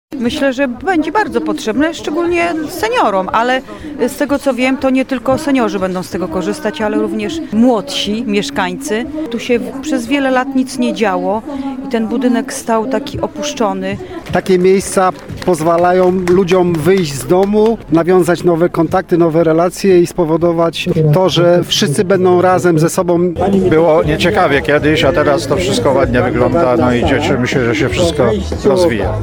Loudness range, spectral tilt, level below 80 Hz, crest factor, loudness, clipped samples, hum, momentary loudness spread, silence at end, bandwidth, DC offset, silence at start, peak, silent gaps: 5 LU; -5.5 dB/octave; -34 dBFS; 12 dB; -13 LUFS; under 0.1%; none; 8 LU; 0 s; 18.5 kHz; 0.4%; 0.1 s; 0 dBFS; none